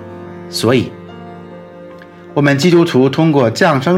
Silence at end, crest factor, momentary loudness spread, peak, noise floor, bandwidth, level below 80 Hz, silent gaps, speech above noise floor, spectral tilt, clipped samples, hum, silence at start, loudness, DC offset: 0 s; 14 dB; 23 LU; 0 dBFS; -35 dBFS; 16 kHz; -56 dBFS; none; 23 dB; -6 dB/octave; under 0.1%; none; 0 s; -13 LUFS; under 0.1%